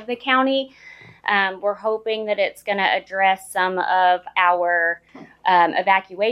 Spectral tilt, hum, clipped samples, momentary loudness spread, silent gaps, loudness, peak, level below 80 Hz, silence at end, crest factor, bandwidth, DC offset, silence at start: -3.5 dB/octave; none; under 0.1%; 7 LU; none; -20 LUFS; -4 dBFS; -68 dBFS; 0 s; 18 dB; 14.5 kHz; under 0.1%; 0 s